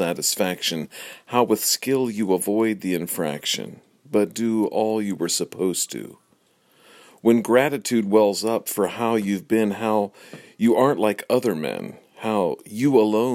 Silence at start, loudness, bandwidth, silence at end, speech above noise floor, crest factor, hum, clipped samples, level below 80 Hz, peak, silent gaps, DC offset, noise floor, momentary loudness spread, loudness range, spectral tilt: 0 s; -22 LUFS; 16.5 kHz; 0 s; 40 dB; 20 dB; none; under 0.1%; -70 dBFS; -2 dBFS; none; under 0.1%; -62 dBFS; 9 LU; 3 LU; -4 dB/octave